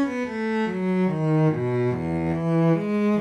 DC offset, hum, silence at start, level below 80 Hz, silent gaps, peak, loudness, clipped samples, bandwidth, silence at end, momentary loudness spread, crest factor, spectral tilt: under 0.1%; none; 0 s; -52 dBFS; none; -10 dBFS; -23 LUFS; under 0.1%; 8.6 kHz; 0 s; 5 LU; 12 dB; -9 dB/octave